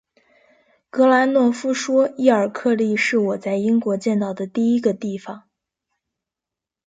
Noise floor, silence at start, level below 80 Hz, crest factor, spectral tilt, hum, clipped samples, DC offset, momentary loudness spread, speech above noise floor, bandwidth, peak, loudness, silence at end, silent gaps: -87 dBFS; 0.95 s; -70 dBFS; 18 dB; -5.5 dB/octave; none; under 0.1%; under 0.1%; 12 LU; 69 dB; 9.2 kHz; -2 dBFS; -19 LUFS; 1.5 s; none